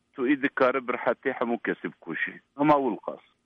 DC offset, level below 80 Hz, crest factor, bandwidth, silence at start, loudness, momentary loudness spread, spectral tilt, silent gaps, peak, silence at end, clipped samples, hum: under 0.1%; -66 dBFS; 18 dB; 5.8 kHz; 0.2 s; -27 LUFS; 12 LU; -8 dB/octave; none; -8 dBFS; 0.3 s; under 0.1%; none